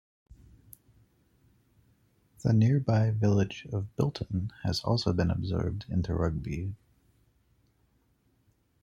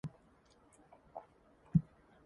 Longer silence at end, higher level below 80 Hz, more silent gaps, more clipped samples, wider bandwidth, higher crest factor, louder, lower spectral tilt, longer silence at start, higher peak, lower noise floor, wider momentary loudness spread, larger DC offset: first, 2.05 s vs 0.45 s; first, -52 dBFS vs -60 dBFS; neither; neither; first, 13.5 kHz vs 10 kHz; second, 20 dB vs 26 dB; first, -29 LUFS vs -37 LUFS; second, -7.5 dB/octave vs -10 dB/octave; first, 2.45 s vs 0.05 s; first, -12 dBFS vs -16 dBFS; about the same, -70 dBFS vs -67 dBFS; second, 11 LU vs 19 LU; neither